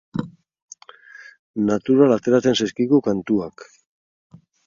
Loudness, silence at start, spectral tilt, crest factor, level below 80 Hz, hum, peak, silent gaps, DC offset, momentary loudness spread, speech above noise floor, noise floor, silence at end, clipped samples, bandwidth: -19 LUFS; 0.15 s; -6 dB/octave; 20 dB; -58 dBFS; none; -2 dBFS; 0.62-0.68 s, 1.39-1.54 s; under 0.1%; 16 LU; 27 dB; -45 dBFS; 1.05 s; under 0.1%; 7.4 kHz